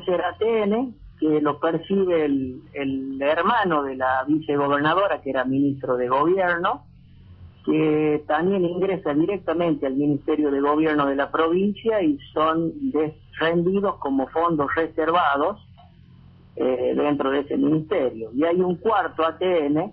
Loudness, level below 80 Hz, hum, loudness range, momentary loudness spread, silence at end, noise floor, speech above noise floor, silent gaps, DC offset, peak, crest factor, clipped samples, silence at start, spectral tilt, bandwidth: -22 LUFS; -54 dBFS; none; 2 LU; 6 LU; 0 s; -49 dBFS; 27 dB; none; under 0.1%; -8 dBFS; 14 dB; under 0.1%; 0 s; -5 dB/octave; 4.8 kHz